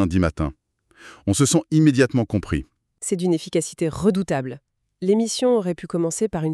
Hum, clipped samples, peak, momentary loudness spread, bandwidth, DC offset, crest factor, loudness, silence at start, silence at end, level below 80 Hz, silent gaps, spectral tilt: none; under 0.1%; -4 dBFS; 11 LU; 13.5 kHz; under 0.1%; 18 dB; -22 LUFS; 0 s; 0 s; -42 dBFS; none; -5.5 dB/octave